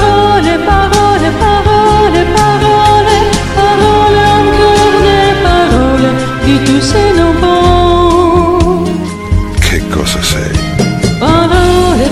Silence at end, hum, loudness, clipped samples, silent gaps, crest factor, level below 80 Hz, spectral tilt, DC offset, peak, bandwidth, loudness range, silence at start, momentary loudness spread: 0 s; none; -8 LUFS; 0.5%; none; 8 dB; -18 dBFS; -5.5 dB/octave; under 0.1%; 0 dBFS; 14.5 kHz; 3 LU; 0 s; 5 LU